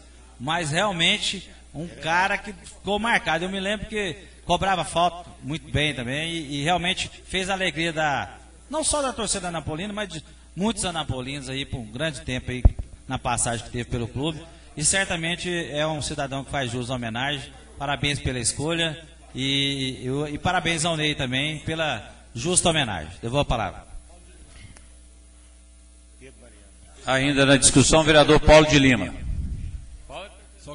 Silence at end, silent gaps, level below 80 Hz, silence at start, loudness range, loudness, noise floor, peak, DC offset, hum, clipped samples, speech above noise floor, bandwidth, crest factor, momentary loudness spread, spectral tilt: 0 s; none; -36 dBFS; 0.05 s; 10 LU; -23 LUFS; -49 dBFS; -2 dBFS; under 0.1%; none; under 0.1%; 26 dB; 11.5 kHz; 24 dB; 17 LU; -3.5 dB/octave